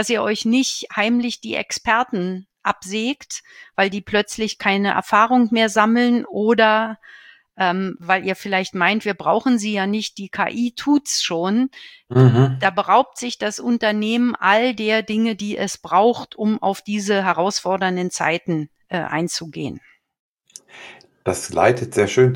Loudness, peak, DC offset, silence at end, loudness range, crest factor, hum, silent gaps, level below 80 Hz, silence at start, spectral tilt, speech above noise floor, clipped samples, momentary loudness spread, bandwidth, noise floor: -19 LUFS; 0 dBFS; under 0.1%; 0 s; 5 LU; 18 dB; none; 20.19-20.36 s; -58 dBFS; 0 s; -5 dB/octave; 26 dB; under 0.1%; 10 LU; 17 kHz; -45 dBFS